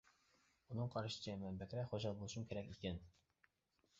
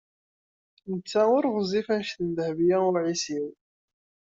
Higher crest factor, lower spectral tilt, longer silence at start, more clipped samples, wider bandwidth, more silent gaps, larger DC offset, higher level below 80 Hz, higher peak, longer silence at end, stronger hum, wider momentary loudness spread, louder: about the same, 18 dB vs 16 dB; about the same, -6 dB/octave vs -5 dB/octave; second, 0.7 s vs 0.85 s; neither; about the same, 7.6 kHz vs 8 kHz; neither; neither; about the same, -66 dBFS vs -68 dBFS; second, -30 dBFS vs -10 dBFS; about the same, 0.9 s vs 0.8 s; neither; second, 5 LU vs 13 LU; second, -47 LUFS vs -26 LUFS